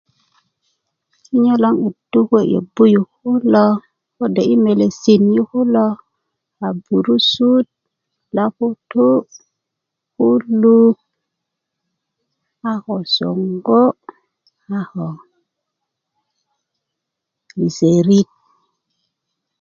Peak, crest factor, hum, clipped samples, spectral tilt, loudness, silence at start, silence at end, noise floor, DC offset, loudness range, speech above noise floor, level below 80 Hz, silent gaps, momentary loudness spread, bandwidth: 0 dBFS; 16 dB; none; under 0.1%; -7 dB/octave; -15 LUFS; 1.3 s; 1.35 s; -80 dBFS; under 0.1%; 7 LU; 66 dB; -62 dBFS; none; 13 LU; 7.2 kHz